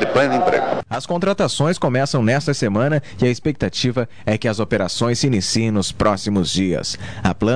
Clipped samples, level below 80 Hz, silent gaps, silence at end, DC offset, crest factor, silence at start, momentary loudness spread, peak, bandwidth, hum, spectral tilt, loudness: under 0.1%; -44 dBFS; none; 0 s; 2%; 16 dB; 0 s; 5 LU; -4 dBFS; 10.5 kHz; none; -5 dB/octave; -19 LUFS